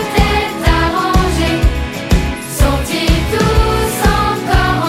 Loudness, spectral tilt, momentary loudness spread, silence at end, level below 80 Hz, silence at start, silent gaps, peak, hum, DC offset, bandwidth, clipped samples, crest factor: -14 LUFS; -5 dB/octave; 3 LU; 0 s; -18 dBFS; 0 s; none; 0 dBFS; none; under 0.1%; 16.5 kHz; under 0.1%; 12 dB